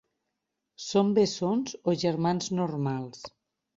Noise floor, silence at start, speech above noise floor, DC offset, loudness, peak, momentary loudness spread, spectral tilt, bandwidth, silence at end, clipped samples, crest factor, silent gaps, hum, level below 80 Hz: -83 dBFS; 0.8 s; 56 dB; under 0.1%; -28 LUFS; -12 dBFS; 16 LU; -6 dB/octave; 7.8 kHz; 0.5 s; under 0.1%; 18 dB; none; none; -68 dBFS